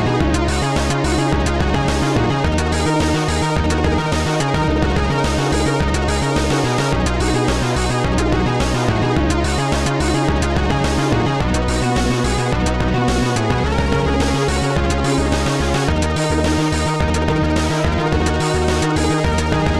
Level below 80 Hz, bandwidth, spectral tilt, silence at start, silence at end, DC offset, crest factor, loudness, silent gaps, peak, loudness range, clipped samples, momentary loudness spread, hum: -24 dBFS; 13 kHz; -5.5 dB/octave; 0 s; 0 s; 0.6%; 14 dB; -17 LUFS; none; -2 dBFS; 0 LU; under 0.1%; 1 LU; none